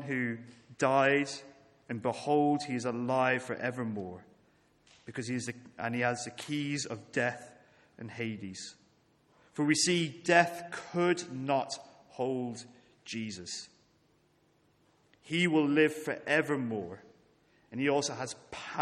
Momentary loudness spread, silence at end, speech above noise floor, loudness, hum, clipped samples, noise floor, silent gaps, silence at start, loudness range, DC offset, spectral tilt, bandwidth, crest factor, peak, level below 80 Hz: 18 LU; 0 s; 37 dB; -32 LUFS; none; under 0.1%; -69 dBFS; none; 0 s; 7 LU; under 0.1%; -4.5 dB/octave; 13.5 kHz; 24 dB; -8 dBFS; -76 dBFS